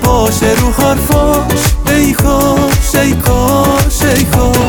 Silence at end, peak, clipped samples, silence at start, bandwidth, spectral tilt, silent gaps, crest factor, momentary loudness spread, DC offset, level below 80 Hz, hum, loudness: 0 s; 0 dBFS; under 0.1%; 0 s; over 20 kHz; -5 dB/octave; none; 10 dB; 1 LU; 0.6%; -16 dBFS; none; -10 LUFS